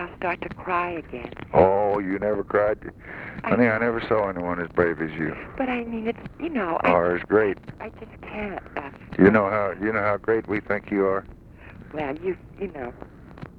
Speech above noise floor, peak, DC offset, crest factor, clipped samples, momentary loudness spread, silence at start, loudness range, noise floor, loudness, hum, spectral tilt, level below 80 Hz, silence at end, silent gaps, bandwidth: 20 dB; -2 dBFS; under 0.1%; 22 dB; under 0.1%; 17 LU; 0 s; 3 LU; -44 dBFS; -24 LUFS; none; -9 dB/octave; -48 dBFS; 0 s; none; 5.4 kHz